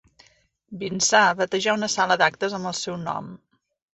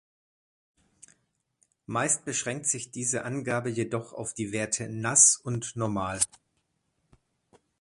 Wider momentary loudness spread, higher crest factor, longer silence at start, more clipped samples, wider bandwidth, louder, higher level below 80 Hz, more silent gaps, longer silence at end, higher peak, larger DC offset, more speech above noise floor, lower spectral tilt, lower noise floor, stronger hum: about the same, 15 LU vs 15 LU; second, 20 dB vs 26 dB; second, 0.7 s vs 1.9 s; neither; second, 8.4 kHz vs 11.5 kHz; first, -22 LUFS vs -26 LUFS; about the same, -66 dBFS vs -62 dBFS; neither; second, 0.6 s vs 1.55 s; about the same, -4 dBFS vs -4 dBFS; neither; second, 36 dB vs 48 dB; about the same, -2.5 dB/octave vs -3 dB/octave; second, -58 dBFS vs -76 dBFS; neither